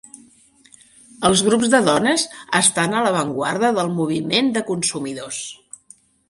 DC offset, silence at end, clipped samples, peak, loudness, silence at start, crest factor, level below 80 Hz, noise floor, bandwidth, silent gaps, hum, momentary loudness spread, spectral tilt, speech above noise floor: under 0.1%; 0.75 s; under 0.1%; 0 dBFS; -18 LUFS; 1.2 s; 20 dB; -56 dBFS; -52 dBFS; 11.5 kHz; none; none; 12 LU; -3 dB/octave; 34 dB